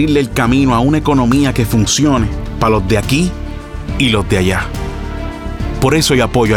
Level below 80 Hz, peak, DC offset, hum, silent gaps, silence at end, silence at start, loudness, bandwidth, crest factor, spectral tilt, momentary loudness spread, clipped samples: -24 dBFS; 0 dBFS; under 0.1%; none; none; 0 s; 0 s; -14 LUFS; 17.5 kHz; 14 dB; -5 dB/octave; 12 LU; under 0.1%